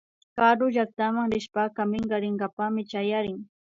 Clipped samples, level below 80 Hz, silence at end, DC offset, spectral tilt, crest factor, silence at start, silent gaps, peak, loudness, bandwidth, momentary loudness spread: under 0.1%; -62 dBFS; 0.35 s; under 0.1%; -6.5 dB/octave; 20 dB; 0.35 s; 2.53-2.57 s; -6 dBFS; -26 LUFS; 7.6 kHz; 8 LU